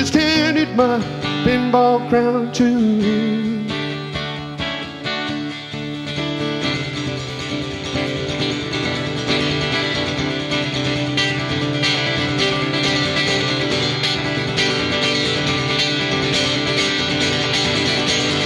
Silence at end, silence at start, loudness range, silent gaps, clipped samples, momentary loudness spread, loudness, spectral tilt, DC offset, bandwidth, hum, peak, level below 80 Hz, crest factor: 0 s; 0 s; 7 LU; none; under 0.1%; 8 LU; -18 LUFS; -4.5 dB/octave; under 0.1%; 12 kHz; none; 0 dBFS; -44 dBFS; 18 dB